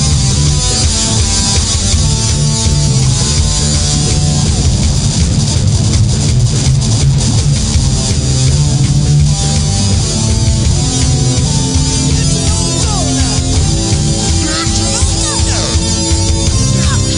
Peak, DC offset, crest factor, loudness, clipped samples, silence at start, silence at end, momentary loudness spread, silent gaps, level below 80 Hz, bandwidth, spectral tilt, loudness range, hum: 0 dBFS; under 0.1%; 10 dB; -11 LUFS; under 0.1%; 0 s; 0 s; 2 LU; none; -18 dBFS; 11 kHz; -4 dB/octave; 1 LU; none